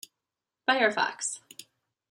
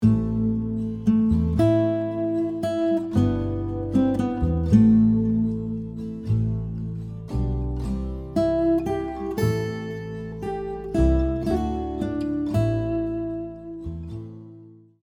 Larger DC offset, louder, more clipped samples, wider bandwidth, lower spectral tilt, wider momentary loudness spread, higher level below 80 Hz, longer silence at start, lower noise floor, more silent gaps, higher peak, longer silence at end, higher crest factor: neither; second, -27 LUFS vs -24 LUFS; neither; first, 16 kHz vs 13 kHz; second, -1 dB/octave vs -9 dB/octave; first, 22 LU vs 13 LU; second, -86 dBFS vs -34 dBFS; first, 0.7 s vs 0 s; first, -88 dBFS vs -47 dBFS; neither; second, -8 dBFS vs -4 dBFS; first, 0.5 s vs 0.3 s; about the same, 22 dB vs 18 dB